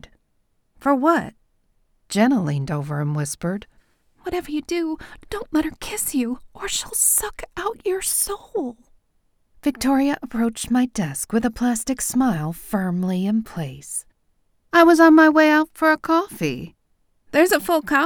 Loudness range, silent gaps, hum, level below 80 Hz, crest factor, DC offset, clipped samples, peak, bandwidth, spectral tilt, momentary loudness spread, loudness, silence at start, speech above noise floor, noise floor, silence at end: 9 LU; none; none; -48 dBFS; 18 dB; under 0.1%; under 0.1%; -4 dBFS; over 20 kHz; -4.5 dB/octave; 14 LU; -20 LUFS; 0.8 s; 46 dB; -66 dBFS; 0 s